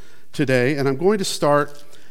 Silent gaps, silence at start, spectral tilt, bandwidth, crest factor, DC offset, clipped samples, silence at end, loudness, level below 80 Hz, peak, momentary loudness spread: none; 0.35 s; -5 dB/octave; 16.5 kHz; 16 dB; 3%; under 0.1%; 0.4 s; -20 LUFS; -64 dBFS; -4 dBFS; 8 LU